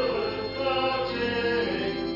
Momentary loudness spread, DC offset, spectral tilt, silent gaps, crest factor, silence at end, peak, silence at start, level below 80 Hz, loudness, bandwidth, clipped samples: 3 LU; under 0.1%; -6 dB/octave; none; 12 dB; 0 s; -16 dBFS; 0 s; -50 dBFS; -27 LUFS; 5.8 kHz; under 0.1%